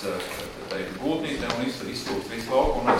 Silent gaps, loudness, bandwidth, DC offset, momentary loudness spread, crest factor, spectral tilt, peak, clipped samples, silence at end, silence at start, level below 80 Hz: none; -28 LUFS; 16.5 kHz; under 0.1%; 9 LU; 20 dB; -4.5 dB/octave; -8 dBFS; under 0.1%; 0 s; 0 s; -42 dBFS